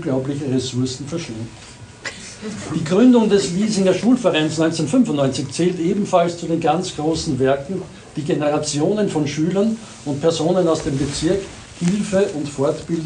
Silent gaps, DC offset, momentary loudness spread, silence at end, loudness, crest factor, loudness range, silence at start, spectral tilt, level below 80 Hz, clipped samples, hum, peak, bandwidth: none; under 0.1%; 14 LU; 0 s; -19 LUFS; 16 dB; 4 LU; 0 s; -5.5 dB/octave; -48 dBFS; under 0.1%; none; -2 dBFS; 10.5 kHz